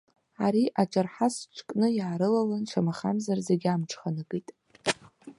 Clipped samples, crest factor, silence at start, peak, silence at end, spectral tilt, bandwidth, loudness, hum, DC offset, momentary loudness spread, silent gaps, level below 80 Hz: under 0.1%; 20 dB; 0.4 s; -8 dBFS; 0.05 s; -6 dB/octave; 11.5 kHz; -29 LUFS; none; under 0.1%; 9 LU; none; -72 dBFS